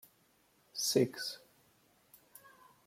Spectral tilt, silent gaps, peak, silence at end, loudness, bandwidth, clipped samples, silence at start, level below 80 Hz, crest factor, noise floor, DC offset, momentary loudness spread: -3.5 dB/octave; none; -16 dBFS; 1.5 s; -34 LUFS; 16.5 kHz; under 0.1%; 0.75 s; -82 dBFS; 24 dB; -71 dBFS; under 0.1%; 26 LU